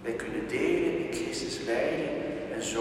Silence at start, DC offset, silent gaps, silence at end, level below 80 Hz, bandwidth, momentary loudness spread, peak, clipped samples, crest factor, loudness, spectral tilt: 0 s; under 0.1%; none; 0 s; -56 dBFS; 13.5 kHz; 6 LU; -16 dBFS; under 0.1%; 14 dB; -31 LUFS; -4 dB/octave